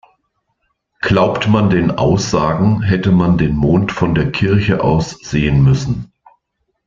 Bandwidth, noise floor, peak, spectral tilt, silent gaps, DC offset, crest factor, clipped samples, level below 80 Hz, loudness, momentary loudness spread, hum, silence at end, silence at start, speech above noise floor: 7.6 kHz; -70 dBFS; 0 dBFS; -7 dB/octave; none; under 0.1%; 14 dB; under 0.1%; -34 dBFS; -14 LUFS; 5 LU; none; 0.85 s; 1.05 s; 56 dB